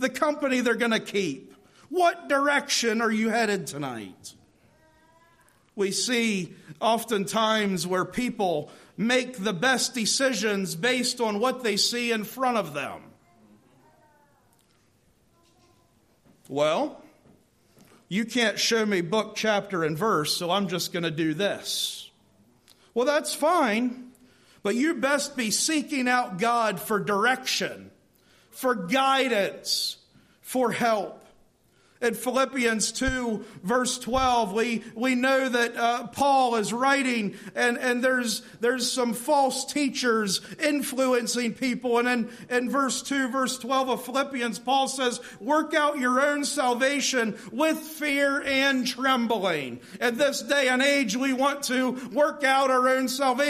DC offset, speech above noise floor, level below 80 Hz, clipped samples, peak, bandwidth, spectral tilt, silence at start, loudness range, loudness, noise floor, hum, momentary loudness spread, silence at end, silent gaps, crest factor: under 0.1%; 39 dB; -58 dBFS; under 0.1%; -10 dBFS; 15.5 kHz; -3 dB/octave; 0 s; 5 LU; -25 LUFS; -64 dBFS; none; 7 LU; 0 s; none; 16 dB